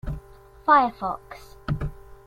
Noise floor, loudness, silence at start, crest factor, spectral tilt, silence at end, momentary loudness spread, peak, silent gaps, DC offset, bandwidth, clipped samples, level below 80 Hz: -47 dBFS; -23 LUFS; 0.05 s; 20 dB; -7.5 dB/octave; 0.1 s; 20 LU; -6 dBFS; none; under 0.1%; 16 kHz; under 0.1%; -40 dBFS